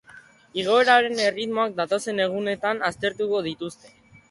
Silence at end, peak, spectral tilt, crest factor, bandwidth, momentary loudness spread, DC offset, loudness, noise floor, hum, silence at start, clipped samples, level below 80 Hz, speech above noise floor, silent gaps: 0.55 s; -6 dBFS; -3.5 dB/octave; 18 dB; 11.5 kHz; 13 LU; under 0.1%; -23 LUFS; -50 dBFS; none; 0.15 s; under 0.1%; -64 dBFS; 27 dB; none